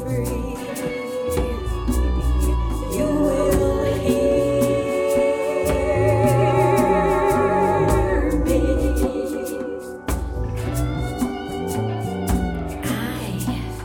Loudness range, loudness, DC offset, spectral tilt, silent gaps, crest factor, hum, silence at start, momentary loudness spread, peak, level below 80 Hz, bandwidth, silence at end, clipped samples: 7 LU; -21 LUFS; under 0.1%; -6.5 dB/octave; none; 16 dB; none; 0 s; 9 LU; -6 dBFS; -28 dBFS; 19.5 kHz; 0 s; under 0.1%